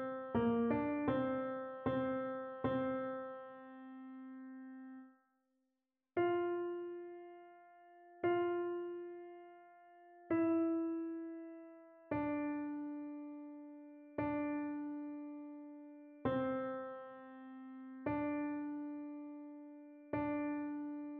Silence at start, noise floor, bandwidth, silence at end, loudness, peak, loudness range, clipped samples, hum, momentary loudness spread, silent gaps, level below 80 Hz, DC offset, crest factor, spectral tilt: 0 s; -89 dBFS; 4.1 kHz; 0 s; -40 LUFS; -24 dBFS; 5 LU; under 0.1%; none; 19 LU; none; -72 dBFS; under 0.1%; 18 dB; -6.5 dB/octave